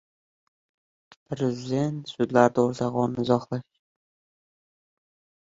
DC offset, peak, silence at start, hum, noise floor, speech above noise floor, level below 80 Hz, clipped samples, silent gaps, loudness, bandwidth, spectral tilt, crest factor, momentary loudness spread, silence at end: under 0.1%; -2 dBFS; 1.3 s; none; under -90 dBFS; over 66 dB; -64 dBFS; under 0.1%; none; -25 LUFS; 7.8 kHz; -7 dB/octave; 24 dB; 12 LU; 1.8 s